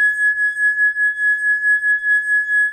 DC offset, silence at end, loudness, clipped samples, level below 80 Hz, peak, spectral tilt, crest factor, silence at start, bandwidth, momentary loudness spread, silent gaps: under 0.1%; 0 s; -15 LUFS; under 0.1%; -62 dBFS; -10 dBFS; 3.5 dB/octave; 8 dB; 0 s; 9 kHz; 1 LU; none